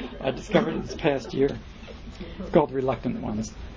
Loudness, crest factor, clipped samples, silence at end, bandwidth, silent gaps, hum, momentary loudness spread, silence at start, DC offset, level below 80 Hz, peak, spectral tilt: -26 LUFS; 22 dB; under 0.1%; 0 s; 7.8 kHz; none; none; 17 LU; 0 s; under 0.1%; -44 dBFS; -4 dBFS; -6.5 dB/octave